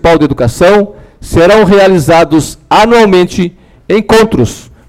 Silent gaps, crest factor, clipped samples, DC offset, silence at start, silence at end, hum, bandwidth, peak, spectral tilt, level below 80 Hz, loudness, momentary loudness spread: none; 6 dB; under 0.1%; 0.4%; 0.05 s; 0.3 s; none; 16.5 kHz; 0 dBFS; -5.5 dB/octave; -28 dBFS; -7 LUFS; 9 LU